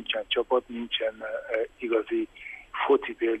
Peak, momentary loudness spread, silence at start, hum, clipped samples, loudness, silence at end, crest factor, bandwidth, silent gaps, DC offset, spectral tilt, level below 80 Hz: -12 dBFS; 11 LU; 0 s; none; under 0.1%; -28 LUFS; 0 s; 18 dB; 8.2 kHz; none; under 0.1%; -4.5 dB/octave; -62 dBFS